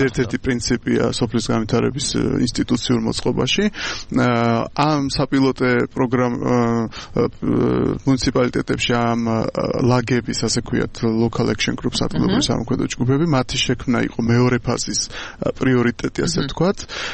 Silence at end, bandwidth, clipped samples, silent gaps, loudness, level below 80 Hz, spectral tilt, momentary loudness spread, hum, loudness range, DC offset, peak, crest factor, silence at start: 0 s; 8.8 kHz; under 0.1%; none; -19 LUFS; -38 dBFS; -5 dB/octave; 4 LU; none; 1 LU; under 0.1%; -4 dBFS; 16 dB; 0 s